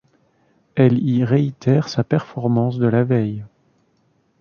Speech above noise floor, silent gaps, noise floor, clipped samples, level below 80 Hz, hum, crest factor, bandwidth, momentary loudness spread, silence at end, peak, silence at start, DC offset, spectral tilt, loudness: 45 dB; none; -62 dBFS; under 0.1%; -58 dBFS; none; 16 dB; 6.8 kHz; 6 LU; 0.95 s; -2 dBFS; 0.75 s; under 0.1%; -8.5 dB/octave; -19 LUFS